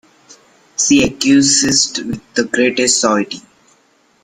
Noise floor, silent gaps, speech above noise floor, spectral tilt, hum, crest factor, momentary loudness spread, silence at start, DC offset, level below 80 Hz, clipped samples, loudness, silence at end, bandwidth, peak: -55 dBFS; none; 41 dB; -2.5 dB/octave; none; 16 dB; 13 LU; 0.8 s; under 0.1%; -48 dBFS; under 0.1%; -13 LUFS; 0.85 s; 12.5 kHz; 0 dBFS